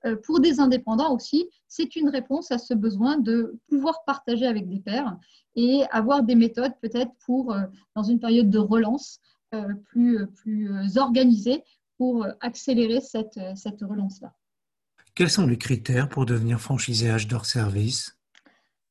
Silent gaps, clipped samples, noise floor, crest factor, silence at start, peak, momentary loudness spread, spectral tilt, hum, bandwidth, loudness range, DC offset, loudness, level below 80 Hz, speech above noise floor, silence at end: none; under 0.1%; -90 dBFS; 18 dB; 0.05 s; -6 dBFS; 12 LU; -6 dB/octave; none; 12 kHz; 4 LU; under 0.1%; -24 LUFS; -56 dBFS; 66 dB; 0.8 s